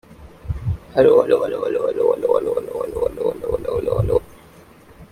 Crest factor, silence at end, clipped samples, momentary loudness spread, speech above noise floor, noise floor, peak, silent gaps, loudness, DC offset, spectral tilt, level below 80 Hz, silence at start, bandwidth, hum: 18 dB; 0.1 s; under 0.1%; 12 LU; 28 dB; -46 dBFS; -2 dBFS; none; -20 LUFS; under 0.1%; -8 dB/octave; -38 dBFS; 0.1 s; 15 kHz; none